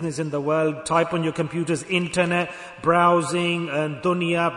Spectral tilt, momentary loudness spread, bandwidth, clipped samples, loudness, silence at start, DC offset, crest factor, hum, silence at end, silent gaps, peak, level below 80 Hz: -5.5 dB/octave; 8 LU; 11 kHz; under 0.1%; -22 LUFS; 0 s; under 0.1%; 16 dB; none; 0 s; none; -6 dBFS; -60 dBFS